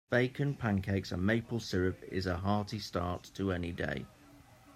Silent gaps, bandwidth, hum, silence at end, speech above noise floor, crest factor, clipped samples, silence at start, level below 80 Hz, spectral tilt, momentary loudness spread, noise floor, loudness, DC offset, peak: none; 15 kHz; none; 0.05 s; 25 dB; 20 dB; under 0.1%; 0.1 s; -60 dBFS; -6.5 dB/octave; 6 LU; -58 dBFS; -35 LUFS; under 0.1%; -14 dBFS